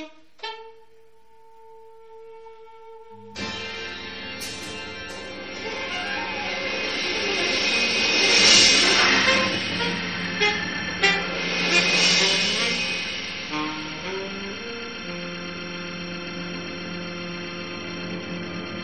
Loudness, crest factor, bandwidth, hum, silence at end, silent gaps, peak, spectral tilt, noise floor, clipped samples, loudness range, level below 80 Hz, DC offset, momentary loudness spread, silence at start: -22 LUFS; 22 dB; 15.5 kHz; none; 0 s; none; -2 dBFS; -1.5 dB/octave; -56 dBFS; under 0.1%; 17 LU; -54 dBFS; 0.4%; 17 LU; 0 s